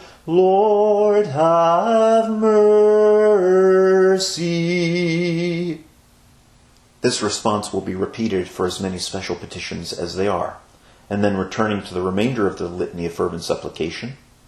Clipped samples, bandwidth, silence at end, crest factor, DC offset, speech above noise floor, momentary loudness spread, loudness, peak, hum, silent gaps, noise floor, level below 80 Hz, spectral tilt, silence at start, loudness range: under 0.1%; 12.5 kHz; 0.3 s; 16 dB; under 0.1%; 33 dB; 13 LU; -18 LUFS; -4 dBFS; none; none; -52 dBFS; -54 dBFS; -5.5 dB/octave; 0 s; 9 LU